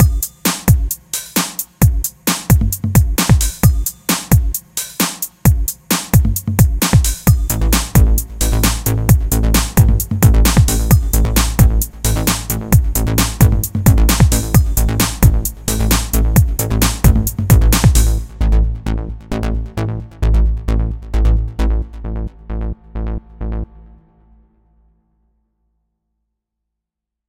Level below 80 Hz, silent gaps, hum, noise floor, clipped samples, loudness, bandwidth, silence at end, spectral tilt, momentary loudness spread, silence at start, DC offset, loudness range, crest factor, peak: -18 dBFS; none; none; -82 dBFS; under 0.1%; -15 LUFS; 17.5 kHz; 3.65 s; -5 dB/octave; 11 LU; 0 s; under 0.1%; 8 LU; 14 dB; 0 dBFS